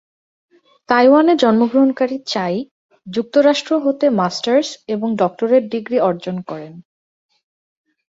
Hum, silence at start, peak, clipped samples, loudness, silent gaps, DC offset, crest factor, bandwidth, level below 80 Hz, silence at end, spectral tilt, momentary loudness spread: none; 0.9 s; -2 dBFS; under 0.1%; -16 LUFS; 2.71-2.89 s; under 0.1%; 16 dB; 7.8 kHz; -64 dBFS; 1.3 s; -5.5 dB/octave; 14 LU